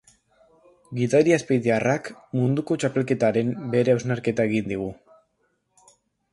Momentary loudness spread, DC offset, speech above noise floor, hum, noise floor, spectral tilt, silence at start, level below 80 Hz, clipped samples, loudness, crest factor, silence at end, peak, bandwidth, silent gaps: 10 LU; under 0.1%; 49 dB; none; -71 dBFS; -6.5 dB/octave; 0.9 s; -60 dBFS; under 0.1%; -23 LUFS; 18 dB; 1.4 s; -6 dBFS; 11.5 kHz; none